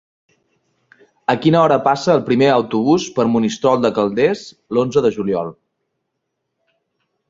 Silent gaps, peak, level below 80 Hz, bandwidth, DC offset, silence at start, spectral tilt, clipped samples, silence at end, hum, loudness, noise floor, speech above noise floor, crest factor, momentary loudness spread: none; -2 dBFS; -56 dBFS; 7.8 kHz; under 0.1%; 1.3 s; -6 dB/octave; under 0.1%; 1.75 s; none; -16 LUFS; -75 dBFS; 59 dB; 16 dB; 8 LU